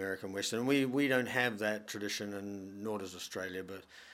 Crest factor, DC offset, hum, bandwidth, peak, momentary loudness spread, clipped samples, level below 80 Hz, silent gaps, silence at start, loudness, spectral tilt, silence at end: 20 dB; under 0.1%; none; 16 kHz; -16 dBFS; 13 LU; under 0.1%; -80 dBFS; none; 0 s; -35 LUFS; -4 dB/octave; 0 s